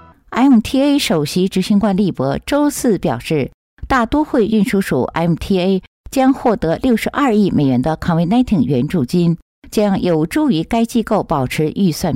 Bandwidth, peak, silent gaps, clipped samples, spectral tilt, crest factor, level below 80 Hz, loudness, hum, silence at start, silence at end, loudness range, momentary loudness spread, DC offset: 16 kHz; -4 dBFS; 3.54-3.77 s, 5.87-6.04 s, 9.42-9.62 s; under 0.1%; -6.5 dB/octave; 10 dB; -38 dBFS; -16 LUFS; none; 0.3 s; 0 s; 2 LU; 4 LU; under 0.1%